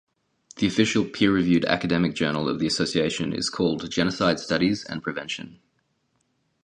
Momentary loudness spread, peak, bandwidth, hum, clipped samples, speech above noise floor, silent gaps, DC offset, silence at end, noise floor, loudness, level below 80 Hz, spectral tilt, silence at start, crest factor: 9 LU; -2 dBFS; 10.5 kHz; none; under 0.1%; 47 dB; none; under 0.1%; 1.1 s; -71 dBFS; -24 LUFS; -54 dBFS; -5 dB/octave; 0.55 s; 22 dB